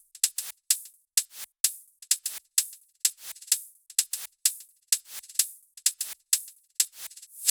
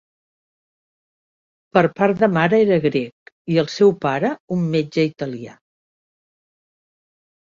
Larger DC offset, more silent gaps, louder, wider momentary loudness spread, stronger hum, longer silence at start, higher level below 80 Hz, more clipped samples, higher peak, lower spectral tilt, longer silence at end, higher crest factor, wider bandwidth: neither; second, 1.60-1.64 s vs 3.12-3.26 s, 3.32-3.45 s, 4.40-4.48 s; second, -28 LUFS vs -19 LUFS; second, 10 LU vs 13 LU; neither; second, 0.15 s vs 1.75 s; second, -88 dBFS vs -62 dBFS; neither; about the same, -4 dBFS vs -2 dBFS; second, 7 dB/octave vs -7 dB/octave; second, 0 s vs 2.05 s; first, 28 dB vs 20 dB; first, over 20 kHz vs 7.4 kHz